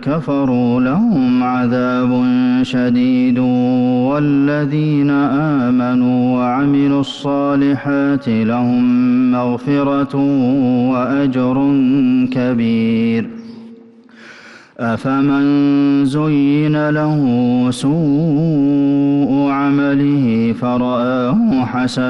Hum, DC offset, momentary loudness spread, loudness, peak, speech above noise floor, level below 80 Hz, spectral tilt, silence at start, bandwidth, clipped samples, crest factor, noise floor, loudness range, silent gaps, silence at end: none; under 0.1%; 3 LU; -14 LUFS; -6 dBFS; 27 dB; -50 dBFS; -8 dB/octave; 0 s; 10.5 kHz; under 0.1%; 6 dB; -41 dBFS; 2 LU; none; 0 s